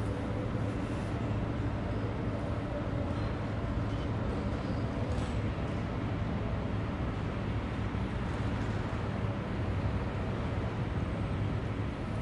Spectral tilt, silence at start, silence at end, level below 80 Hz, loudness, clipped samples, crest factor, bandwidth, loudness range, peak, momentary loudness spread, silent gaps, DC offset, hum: -8 dB/octave; 0 s; 0 s; -42 dBFS; -35 LUFS; under 0.1%; 14 dB; 10.5 kHz; 0 LU; -20 dBFS; 1 LU; none; under 0.1%; none